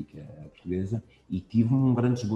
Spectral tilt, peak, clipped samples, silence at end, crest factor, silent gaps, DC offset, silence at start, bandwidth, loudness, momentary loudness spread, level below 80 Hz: -9 dB/octave; -12 dBFS; under 0.1%; 0 s; 16 dB; none; under 0.1%; 0 s; 8 kHz; -27 LUFS; 20 LU; -60 dBFS